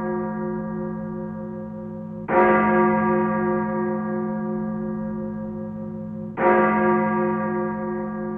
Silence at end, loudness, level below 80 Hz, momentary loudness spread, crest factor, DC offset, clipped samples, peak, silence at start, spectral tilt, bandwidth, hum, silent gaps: 0 s; -23 LUFS; -52 dBFS; 14 LU; 18 dB; under 0.1%; under 0.1%; -6 dBFS; 0 s; -11 dB/octave; 3.5 kHz; none; none